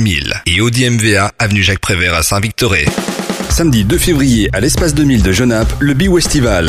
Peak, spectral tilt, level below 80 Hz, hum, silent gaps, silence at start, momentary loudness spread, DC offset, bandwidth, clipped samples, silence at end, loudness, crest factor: 0 dBFS; -4.5 dB/octave; -22 dBFS; none; none; 0 s; 3 LU; under 0.1%; 15.5 kHz; under 0.1%; 0 s; -12 LUFS; 12 dB